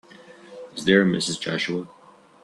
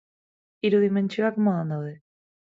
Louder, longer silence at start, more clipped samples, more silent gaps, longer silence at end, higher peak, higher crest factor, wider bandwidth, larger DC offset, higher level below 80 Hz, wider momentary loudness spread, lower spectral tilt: about the same, -22 LUFS vs -24 LUFS; second, 0.3 s vs 0.65 s; neither; neither; about the same, 0.55 s vs 0.45 s; first, -4 dBFS vs -10 dBFS; first, 22 dB vs 16 dB; first, 11.5 kHz vs 7.4 kHz; neither; first, -64 dBFS vs -74 dBFS; first, 24 LU vs 10 LU; second, -4.5 dB/octave vs -8.5 dB/octave